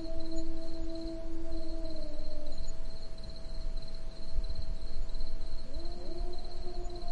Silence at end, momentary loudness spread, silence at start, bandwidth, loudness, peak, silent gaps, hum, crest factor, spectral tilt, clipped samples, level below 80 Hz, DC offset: 0 s; 5 LU; 0 s; 7.2 kHz; -43 LUFS; -16 dBFS; none; none; 10 dB; -6 dB/octave; under 0.1%; -34 dBFS; under 0.1%